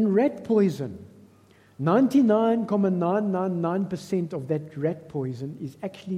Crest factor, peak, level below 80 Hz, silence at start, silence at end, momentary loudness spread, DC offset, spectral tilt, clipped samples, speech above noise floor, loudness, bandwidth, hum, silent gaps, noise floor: 16 dB; -8 dBFS; -68 dBFS; 0 s; 0 s; 15 LU; under 0.1%; -8.5 dB/octave; under 0.1%; 32 dB; -25 LUFS; 13.5 kHz; none; none; -56 dBFS